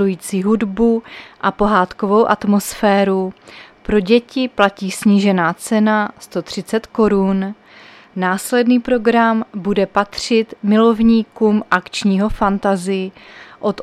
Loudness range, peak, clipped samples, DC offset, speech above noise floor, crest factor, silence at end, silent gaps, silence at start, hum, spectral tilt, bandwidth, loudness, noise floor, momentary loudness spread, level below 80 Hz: 2 LU; 0 dBFS; under 0.1%; under 0.1%; 27 dB; 16 dB; 0 s; none; 0 s; none; -5.5 dB/octave; 14.5 kHz; -16 LUFS; -42 dBFS; 9 LU; -40 dBFS